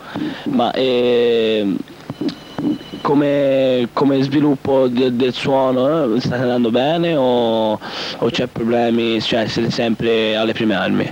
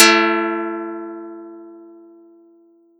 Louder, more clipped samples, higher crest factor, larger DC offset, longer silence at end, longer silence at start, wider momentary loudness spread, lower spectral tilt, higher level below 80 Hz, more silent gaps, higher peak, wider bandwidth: about the same, -17 LUFS vs -18 LUFS; neither; second, 12 dB vs 20 dB; neither; second, 0 s vs 1.1 s; about the same, 0 s vs 0 s; second, 8 LU vs 25 LU; first, -6.5 dB/octave vs -1.5 dB/octave; first, -54 dBFS vs -78 dBFS; neither; second, -4 dBFS vs 0 dBFS; about the same, 16.5 kHz vs 15.5 kHz